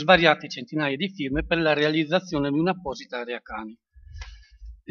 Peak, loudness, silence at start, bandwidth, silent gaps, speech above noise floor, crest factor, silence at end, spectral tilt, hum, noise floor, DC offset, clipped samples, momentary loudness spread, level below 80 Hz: 0 dBFS; -24 LUFS; 0 s; 7 kHz; none; 21 dB; 24 dB; 0.15 s; -5.5 dB/octave; none; -45 dBFS; under 0.1%; under 0.1%; 22 LU; -46 dBFS